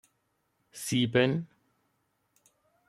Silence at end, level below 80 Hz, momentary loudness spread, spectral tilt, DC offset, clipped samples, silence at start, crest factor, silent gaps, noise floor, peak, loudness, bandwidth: 1.45 s; -72 dBFS; 23 LU; -5 dB/octave; under 0.1%; under 0.1%; 0.75 s; 22 dB; none; -76 dBFS; -12 dBFS; -28 LUFS; 15 kHz